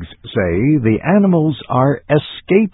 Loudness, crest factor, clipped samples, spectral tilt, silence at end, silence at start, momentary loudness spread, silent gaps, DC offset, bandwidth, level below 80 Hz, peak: -15 LUFS; 14 dB; under 0.1%; -12.5 dB/octave; 0.05 s; 0 s; 5 LU; none; under 0.1%; 4.1 kHz; -38 dBFS; 0 dBFS